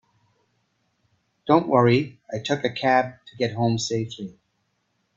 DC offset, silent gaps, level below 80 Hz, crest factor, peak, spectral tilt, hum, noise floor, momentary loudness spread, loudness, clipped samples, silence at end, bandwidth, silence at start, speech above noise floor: under 0.1%; none; -64 dBFS; 22 dB; -2 dBFS; -5.5 dB/octave; none; -72 dBFS; 15 LU; -23 LUFS; under 0.1%; 0.85 s; 7.8 kHz; 1.45 s; 50 dB